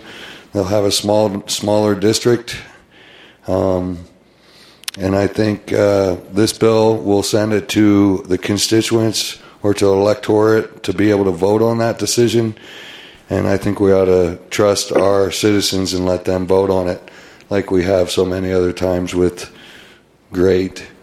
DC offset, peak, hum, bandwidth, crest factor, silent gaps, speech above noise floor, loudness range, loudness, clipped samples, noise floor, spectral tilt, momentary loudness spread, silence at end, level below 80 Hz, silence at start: under 0.1%; 0 dBFS; none; 15 kHz; 16 dB; none; 32 dB; 4 LU; -15 LUFS; under 0.1%; -47 dBFS; -5 dB/octave; 11 LU; 0.15 s; -48 dBFS; 0.05 s